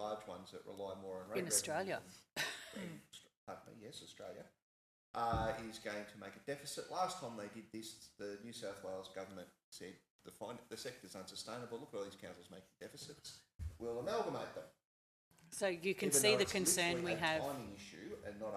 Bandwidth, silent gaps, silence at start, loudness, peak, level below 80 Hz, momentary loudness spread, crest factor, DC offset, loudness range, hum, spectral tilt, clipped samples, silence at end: 15 kHz; 3.37-3.47 s, 4.62-5.14 s, 9.64-9.72 s, 10.10-10.19 s, 13.55-13.59 s, 14.85-15.31 s; 0 s; -41 LUFS; -16 dBFS; -66 dBFS; 20 LU; 26 dB; under 0.1%; 14 LU; none; -2.5 dB/octave; under 0.1%; 0 s